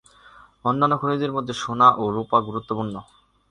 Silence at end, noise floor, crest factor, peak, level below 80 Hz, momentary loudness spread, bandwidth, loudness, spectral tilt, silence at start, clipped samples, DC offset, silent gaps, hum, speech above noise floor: 0.5 s; -50 dBFS; 20 dB; -2 dBFS; -58 dBFS; 12 LU; 10.5 kHz; -22 LUFS; -6 dB/octave; 0.65 s; under 0.1%; under 0.1%; none; none; 29 dB